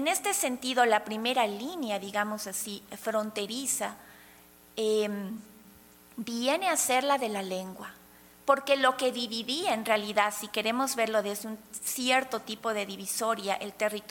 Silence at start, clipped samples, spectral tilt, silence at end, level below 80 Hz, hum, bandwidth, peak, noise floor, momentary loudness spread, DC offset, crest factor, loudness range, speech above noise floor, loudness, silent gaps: 0 s; under 0.1%; -2 dB/octave; 0 s; -72 dBFS; 60 Hz at -65 dBFS; 17.5 kHz; -8 dBFS; -56 dBFS; 12 LU; under 0.1%; 22 dB; 5 LU; 26 dB; -29 LUFS; none